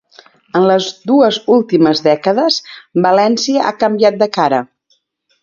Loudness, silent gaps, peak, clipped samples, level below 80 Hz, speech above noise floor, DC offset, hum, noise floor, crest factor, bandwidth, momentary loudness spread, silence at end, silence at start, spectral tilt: -13 LUFS; none; 0 dBFS; under 0.1%; -60 dBFS; 49 dB; under 0.1%; none; -61 dBFS; 14 dB; 7.4 kHz; 6 LU; 0.8 s; 0.55 s; -5 dB/octave